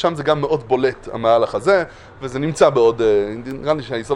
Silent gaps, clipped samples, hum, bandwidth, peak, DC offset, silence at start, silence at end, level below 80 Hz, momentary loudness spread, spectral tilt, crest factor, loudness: none; under 0.1%; none; 11 kHz; 0 dBFS; under 0.1%; 0 s; 0 s; -46 dBFS; 11 LU; -6 dB/octave; 18 dB; -18 LUFS